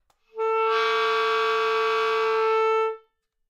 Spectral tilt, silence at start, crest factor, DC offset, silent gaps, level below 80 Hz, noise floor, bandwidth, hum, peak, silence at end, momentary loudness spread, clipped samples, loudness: -0.5 dB/octave; 0.35 s; 12 dB; under 0.1%; none; -82 dBFS; -65 dBFS; 8.6 kHz; none; -12 dBFS; 0.5 s; 8 LU; under 0.1%; -23 LUFS